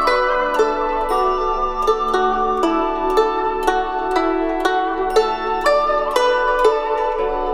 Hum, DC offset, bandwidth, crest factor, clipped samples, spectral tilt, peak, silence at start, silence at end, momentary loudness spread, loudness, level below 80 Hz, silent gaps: none; under 0.1%; 16 kHz; 16 dB; under 0.1%; -3.5 dB/octave; -2 dBFS; 0 s; 0 s; 4 LU; -18 LUFS; -36 dBFS; none